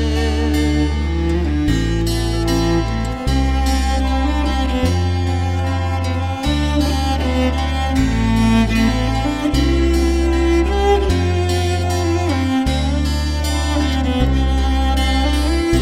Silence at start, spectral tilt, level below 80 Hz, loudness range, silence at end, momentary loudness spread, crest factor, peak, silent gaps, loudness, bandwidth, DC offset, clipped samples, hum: 0 s; -6 dB/octave; -20 dBFS; 2 LU; 0 s; 4 LU; 14 dB; -2 dBFS; none; -18 LUFS; 14.5 kHz; under 0.1%; under 0.1%; none